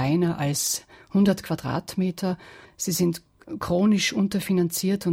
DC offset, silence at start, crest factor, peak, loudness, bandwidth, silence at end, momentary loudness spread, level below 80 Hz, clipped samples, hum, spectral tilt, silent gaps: under 0.1%; 0 s; 14 dB; -10 dBFS; -24 LUFS; 17 kHz; 0 s; 9 LU; -56 dBFS; under 0.1%; none; -5 dB/octave; none